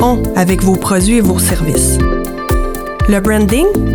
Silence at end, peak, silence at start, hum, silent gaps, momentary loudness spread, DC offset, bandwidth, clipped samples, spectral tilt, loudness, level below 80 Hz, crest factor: 0 s; 0 dBFS; 0 s; none; none; 6 LU; under 0.1%; over 20 kHz; under 0.1%; -5.5 dB/octave; -12 LUFS; -20 dBFS; 12 dB